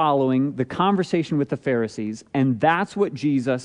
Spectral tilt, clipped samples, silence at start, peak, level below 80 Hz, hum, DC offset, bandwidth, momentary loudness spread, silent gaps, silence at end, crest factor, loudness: -7 dB/octave; under 0.1%; 0 s; -6 dBFS; -62 dBFS; none; under 0.1%; 10.5 kHz; 5 LU; none; 0 s; 16 dB; -22 LUFS